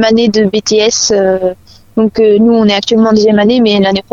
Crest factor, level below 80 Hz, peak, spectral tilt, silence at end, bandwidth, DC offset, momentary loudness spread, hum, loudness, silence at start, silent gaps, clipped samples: 8 dB; -42 dBFS; 0 dBFS; -4.5 dB/octave; 0.1 s; 7.6 kHz; under 0.1%; 6 LU; none; -9 LUFS; 0 s; none; under 0.1%